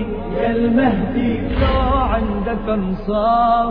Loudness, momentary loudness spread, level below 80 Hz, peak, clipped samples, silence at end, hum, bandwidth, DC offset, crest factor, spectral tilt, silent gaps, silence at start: -18 LUFS; 6 LU; -26 dBFS; -4 dBFS; under 0.1%; 0 s; none; 5.2 kHz; under 0.1%; 12 dB; -10.5 dB/octave; none; 0 s